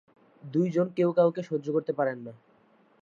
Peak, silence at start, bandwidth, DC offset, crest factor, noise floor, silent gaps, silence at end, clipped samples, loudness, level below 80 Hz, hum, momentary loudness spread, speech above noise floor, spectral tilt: -10 dBFS; 0.45 s; 7.2 kHz; under 0.1%; 18 dB; -63 dBFS; none; 0.65 s; under 0.1%; -27 LUFS; -80 dBFS; none; 9 LU; 36 dB; -9 dB/octave